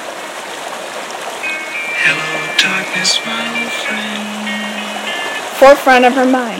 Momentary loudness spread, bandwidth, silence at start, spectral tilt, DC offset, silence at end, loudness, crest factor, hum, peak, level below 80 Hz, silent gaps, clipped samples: 16 LU; 18 kHz; 0 s; -2 dB/octave; under 0.1%; 0 s; -14 LUFS; 14 dB; none; 0 dBFS; -52 dBFS; none; 0.9%